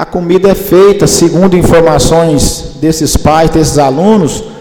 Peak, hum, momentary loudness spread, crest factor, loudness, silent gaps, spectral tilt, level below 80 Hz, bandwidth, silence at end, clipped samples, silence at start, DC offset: 0 dBFS; none; 5 LU; 6 dB; -7 LUFS; none; -5 dB/octave; -22 dBFS; 19.5 kHz; 0 s; 0.4%; 0 s; under 0.1%